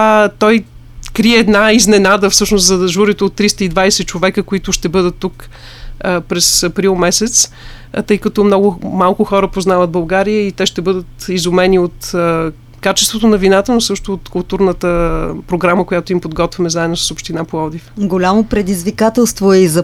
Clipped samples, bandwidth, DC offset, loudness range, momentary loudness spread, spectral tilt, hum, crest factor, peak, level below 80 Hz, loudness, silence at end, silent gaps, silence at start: under 0.1%; 16.5 kHz; under 0.1%; 5 LU; 11 LU; -4 dB/octave; none; 12 dB; 0 dBFS; -32 dBFS; -12 LUFS; 0 s; none; 0 s